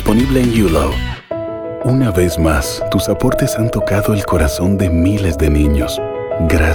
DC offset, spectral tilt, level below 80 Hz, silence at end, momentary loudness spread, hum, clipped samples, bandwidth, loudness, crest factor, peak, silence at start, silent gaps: under 0.1%; -6 dB/octave; -24 dBFS; 0 s; 8 LU; none; under 0.1%; 20 kHz; -15 LUFS; 14 dB; 0 dBFS; 0 s; none